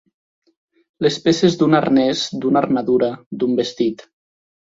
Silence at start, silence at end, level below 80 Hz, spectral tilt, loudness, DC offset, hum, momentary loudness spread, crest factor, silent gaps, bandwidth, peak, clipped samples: 1 s; 0.75 s; -58 dBFS; -5.5 dB/octave; -18 LUFS; under 0.1%; none; 8 LU; 18 dB; 3.26-3.31 s; 7.8 kHz; -2 dBFS; under 0.1%